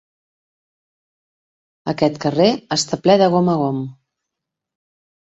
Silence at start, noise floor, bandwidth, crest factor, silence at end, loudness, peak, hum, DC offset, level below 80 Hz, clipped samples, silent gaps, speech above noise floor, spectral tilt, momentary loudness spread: 1.85 s; -82 dBFS; 8.2 kHz; 20 dB; 1.3 s; -17 LUFS; -2 dBFS; none; under 0.1%; -60 dBFS; under 0.1%; none; 66 dB; -5.5 dB/octave; 13 LU